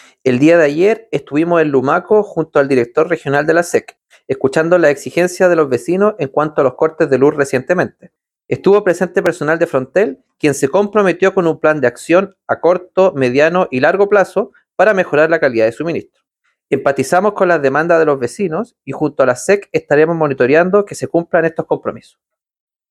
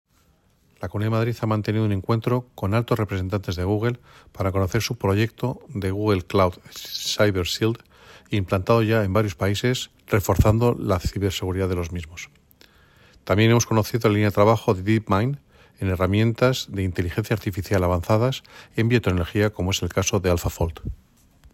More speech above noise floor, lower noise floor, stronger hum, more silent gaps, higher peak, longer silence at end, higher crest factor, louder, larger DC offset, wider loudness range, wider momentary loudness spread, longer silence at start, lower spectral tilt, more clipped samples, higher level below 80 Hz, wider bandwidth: first, 53 dB vs 39 dB; first, -66 dBFS vs -61 dBFS; neither; neither; first, 0 dBFS vs -4 dBFS; first, 0.95 s vs 0.6 s; about the same, 14 dB vs 18 dB; first, -14 LUFS vs -23 LUFS; neither; about the same, 2 LU vs 3 LU; about the same, 8 LU vs 10 LU; second, 0.25 s vs 0.8 s; about the same, -6 dB/octave vs -6 dB/octave; neither; second, -58 dBFS vs -40 dBFS; second, 13 kHz vs 16.5 kHz